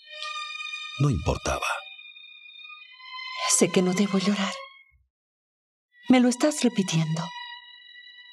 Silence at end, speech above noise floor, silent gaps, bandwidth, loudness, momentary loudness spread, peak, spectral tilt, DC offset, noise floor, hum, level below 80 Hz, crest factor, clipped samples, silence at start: 0 s; 25 dB; 5.10-5.89 s; 13.5 kHz; -25 LUFS; 23 LU; -6 dBFS; -4.5 dB/octave; under 0.1%; -48 dBFS; none; -48 dBFS; 22 dB; under 0.1%; 0.05 s